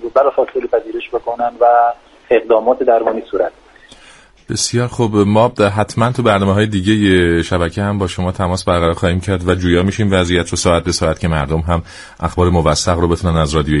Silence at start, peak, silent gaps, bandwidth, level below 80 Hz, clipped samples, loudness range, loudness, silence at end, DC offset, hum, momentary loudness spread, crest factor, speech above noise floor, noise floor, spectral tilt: 0 s; 0 dBFS; none; 11.5 kHz; -32 dBFS; under 0.1%; 2 LU; -15 LUFS; 0 s; under 0.1%; none; 8 LU; 14 dB; 29 dB; -43 dBFS; -5.5 dB/octave